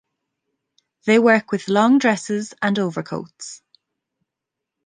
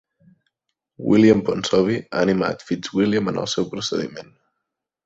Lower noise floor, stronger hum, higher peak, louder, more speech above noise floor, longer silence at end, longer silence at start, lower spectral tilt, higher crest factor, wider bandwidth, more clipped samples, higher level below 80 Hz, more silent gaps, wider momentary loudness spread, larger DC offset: about the same, -84 dBFS vs -81 dBFS; neither; about the same, -2 dBFS vs -2 dBFS; about the same, -18 LUFS vs -20 LUFS; first, 65 dB vs 61 dB; first, 1.3 s vs 0.8 s; about the same, 1.05 s vs 1 s; about the same, -5 dB/octave vs -5.5 dB/octave; about the same, 18 dB vs 20 dB; first, 9.8 kHz vs 8 kHz; neither; second, -68 dBFS vs -56 dBFS; neither; first, 17 LU vs 12 LU; neither